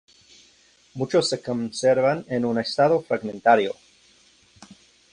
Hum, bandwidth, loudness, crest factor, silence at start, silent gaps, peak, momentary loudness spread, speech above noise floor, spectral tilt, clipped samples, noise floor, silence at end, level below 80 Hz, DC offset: none; 11 kHz; -22 LUFS; 20 dB; 0.95 s; none; -4 dBFS; 10 LU; 36 dB; -5 dB/octave; under 0.1%; -58 dBFS; 1.4 s; -64 dBFS; under 0.1%